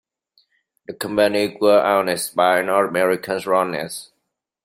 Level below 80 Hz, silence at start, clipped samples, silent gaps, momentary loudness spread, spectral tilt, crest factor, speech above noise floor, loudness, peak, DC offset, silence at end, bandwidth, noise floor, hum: -64 dBFS; 0.9 s; under 0.1%; none; 13 LU; -4 dB/octave; 18 dB; 57 dB; -19 LUFS; -2 dBFS; under 0.1%; 0.6 s; 16 kHz; -76 dBFS; none